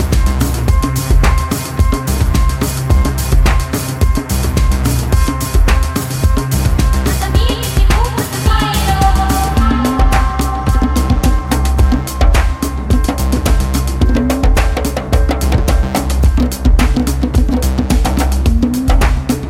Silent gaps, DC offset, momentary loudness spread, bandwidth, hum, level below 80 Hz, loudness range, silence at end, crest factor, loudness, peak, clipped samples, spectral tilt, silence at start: none; under 0.1%; 3 LU; 16.5 kHz; none; -14 dBFS; 1 LU; 0 s; 12 dB; -14 LUFS; 0 dBFS; under 0.1%; -5.5 dB/octave; 0 s